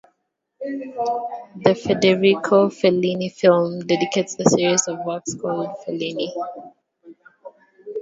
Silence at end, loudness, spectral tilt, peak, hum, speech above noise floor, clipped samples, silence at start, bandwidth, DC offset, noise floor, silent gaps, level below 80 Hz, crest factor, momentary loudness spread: 0 s; -20 LUFS; -4.5 dB/octave; 0 dBFS; none; 54 dB; under 0.1%; 0.6 s; 8 kHz; under 0.1%; -74 dBFS; none; -62 dBFS; 20 dB; 14 LU